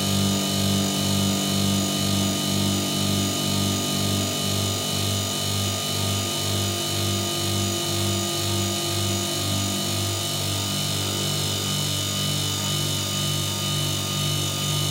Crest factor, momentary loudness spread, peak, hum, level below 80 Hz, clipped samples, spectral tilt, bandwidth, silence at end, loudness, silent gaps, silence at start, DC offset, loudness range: 14 dB; 2 LU; -10 dBFS; 50 Hz at -35 dBFS; -54 dBFS; under 0.1%; -3.5 dB/octave; 16 kHz; 0 s; -23 LUFS; none; 0 s; under 0.1%; 1 LU